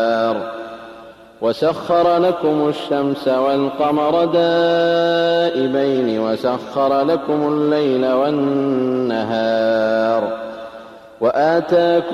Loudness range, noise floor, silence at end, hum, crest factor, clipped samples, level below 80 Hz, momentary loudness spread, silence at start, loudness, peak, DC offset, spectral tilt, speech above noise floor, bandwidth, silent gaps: 2 LU; -39 dBFS; 0 s; none; 12 dB; under 0.1%; -58 dBFS; 9 LU; 0 s; -17 LUFS; -4 dBFS; under 0.1%; -6.5 dB/octave; 23 dB; 12.5 kHz; none